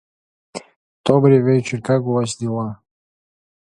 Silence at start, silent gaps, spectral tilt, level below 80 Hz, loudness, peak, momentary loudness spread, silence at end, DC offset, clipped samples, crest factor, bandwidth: 0.55 s; 0.76-1.04 s; -7 dB/octave; -60 dBFS; -18 LUFS; 0 dBFS; 22 LU; 1 s; under 0.1%; under 0.1%; 20 dB; 11 kHz